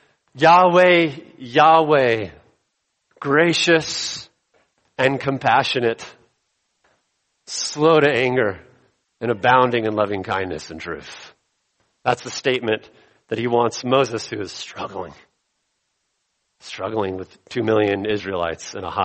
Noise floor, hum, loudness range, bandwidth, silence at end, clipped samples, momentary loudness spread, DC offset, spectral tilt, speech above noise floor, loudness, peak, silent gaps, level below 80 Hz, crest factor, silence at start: -73 dBFS; none; 9 LU; 8.8 kHz; 0 s; under 0.1%; 18 LU; under 0.1%; -4.5 dB/octave; 54 dB; -19 LUFS; -2 dBFS; none; -58 dBFS; 20 dB; 0.35 s